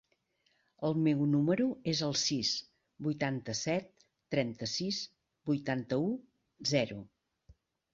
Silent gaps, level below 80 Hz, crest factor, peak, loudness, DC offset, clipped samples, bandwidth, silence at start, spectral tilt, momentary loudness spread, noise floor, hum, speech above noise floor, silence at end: none; -70 dBFS; 20 dB; -16 dBFS; -33 LUFS; under 0.1%; under 0.1%; 7.8 kHz; 0.8 s; -4.5 dB/octave; 9 LU; -76 dBFS; none; 43 dB; 0.4 s